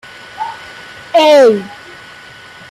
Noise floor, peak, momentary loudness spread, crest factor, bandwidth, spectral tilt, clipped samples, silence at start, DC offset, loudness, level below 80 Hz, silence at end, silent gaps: -36 dBFS; -2 dBFS; 26 LU; 12 dB; 15.5 kHz; -4 dB/octave; under 0.1%; 0.35 s; under 0.1%; -9 LUFS; -58 dBFS; 0.95 s; none